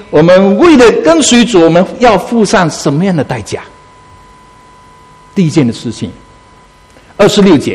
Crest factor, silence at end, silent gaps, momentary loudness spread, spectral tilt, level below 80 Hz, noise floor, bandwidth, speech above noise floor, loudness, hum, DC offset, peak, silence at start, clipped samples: 10 dB; 0 s; none; 14 LU; -5 dB/octave; -38 dBFS; -40 dBFS; 13.5 kHz; 33 dB; -8 LUFS; none; under 0.1%; 0 dBFS; 0 s; 1%